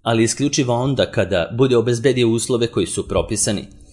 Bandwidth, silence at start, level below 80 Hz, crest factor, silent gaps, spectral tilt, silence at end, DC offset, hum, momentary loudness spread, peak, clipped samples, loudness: 11.5 kHz; 0.05 s; -44 dBFS; 16 dB; none; -4.5 dB/octave; 0.25 s; under 0.1%; none; 4 LU; -2 dBFS; under 0.1%; -18 LUFS